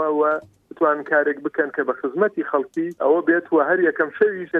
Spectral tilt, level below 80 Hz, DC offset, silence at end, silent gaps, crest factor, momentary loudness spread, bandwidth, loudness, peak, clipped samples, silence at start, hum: -8 dB/octave; -72 dBFS; under 0.1%; 0 s; none; 16 dB; 5 LU; 3.9 kHz; -21 LUFS; -6 dBFS; under 0.1%; 0 s; none